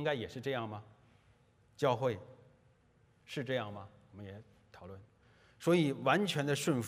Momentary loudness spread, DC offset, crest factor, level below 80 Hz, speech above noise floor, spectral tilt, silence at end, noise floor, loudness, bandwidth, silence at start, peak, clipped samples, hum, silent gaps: 22 LU; under 0.1%; 22 dB; -74 dBFS; 34 dB; -5.5 dB/octave; 0 s; -69 dBFS; -35 LUFS; 15.5 kHz; 0 s; -14 dBFS; under 0.1%; none; none